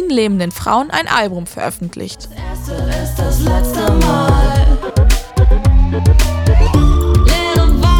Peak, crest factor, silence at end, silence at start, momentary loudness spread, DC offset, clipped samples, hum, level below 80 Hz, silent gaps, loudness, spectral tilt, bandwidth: 0 dBFS; 12 dB; 0 s; 0 s; 11 LU; under 0.1%; under 0.1%; none; -14 dBFS; none; -14 LUFS; -6 dB/octave; 18.5 kHz